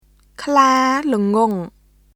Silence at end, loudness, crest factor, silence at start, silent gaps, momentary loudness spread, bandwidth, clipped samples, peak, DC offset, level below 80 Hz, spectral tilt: 0.45 s; -16 LUFS; 18 dB; 0.4 s; none; 15 LU; 16 kHz; under 0.1%; 0 dBFS; under 0.1%; -54 dBFS; -5 dB/octave